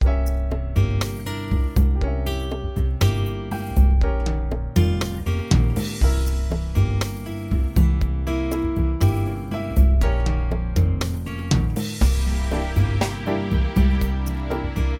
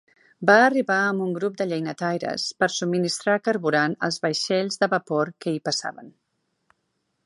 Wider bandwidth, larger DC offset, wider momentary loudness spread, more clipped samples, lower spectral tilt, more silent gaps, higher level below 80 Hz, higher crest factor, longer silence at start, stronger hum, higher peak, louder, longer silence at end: first, 16.5 kHz vs 11.5 kHz; neither; second, 6 LU vs 9 LU; neither; first, -6.5 dB/octave vs -4 dB/octave; neither; first, -22 dBFS vs -72 dBFS; second, 16 dB vs 22 dB; second, 0 s vs 0.4 s; neither; about the same, -4 dBFS vs -2 dBFS; about the same, -22 LUFS vs -23 LUFS; second, 0 s vs 1.15 s